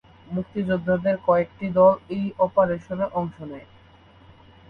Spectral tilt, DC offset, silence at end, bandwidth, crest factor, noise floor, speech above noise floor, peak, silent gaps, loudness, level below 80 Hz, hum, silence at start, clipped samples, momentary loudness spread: -9.5 dB/octave; under 0.1%; 1.1 s; 4.9 kHz; 18 dB; -51 dBFS; 29 dB; -6 dBFS; none; -23 LUFS; -54 dBFS; none; 0.3 s; under 0.1%; 14 LU